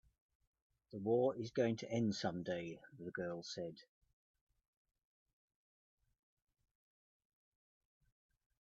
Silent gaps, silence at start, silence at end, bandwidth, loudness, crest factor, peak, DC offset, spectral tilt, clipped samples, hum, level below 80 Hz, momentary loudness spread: none; 0.95 s; 4.8 s; 7.6 kHz; -41 LUFS; 22 dB; -22 dBFS; under 0.1%; -5.5 dB/octave; under 0.1%; none; -80 dBFS; 14 LU